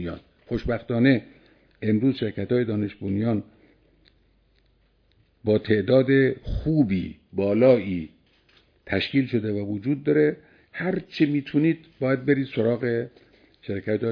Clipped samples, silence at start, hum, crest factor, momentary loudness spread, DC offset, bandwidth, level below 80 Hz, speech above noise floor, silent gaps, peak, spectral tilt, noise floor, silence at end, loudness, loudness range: under 0.1%; 0 s; none; 20 dB; 12 LU; under 0.1%; 5.4 kHz; -46 dBFS; 40 dB; none; -4 dBFS; -9.5 dB/octave; -63 dBFS; 0 s; -24 LUFS; 5 LU